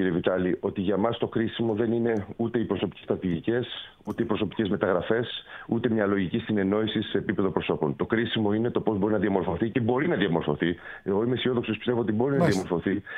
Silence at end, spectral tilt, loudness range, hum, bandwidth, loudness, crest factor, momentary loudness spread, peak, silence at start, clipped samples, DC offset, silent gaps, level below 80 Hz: 0 s; -7 dB/octave; 2 LU; none; 11.5 kHz; -27 LUFS; 18 dB; 5 LU; -8 dBFS; 0 s; under 0.1%; under 0.1%; none; -56 dBFS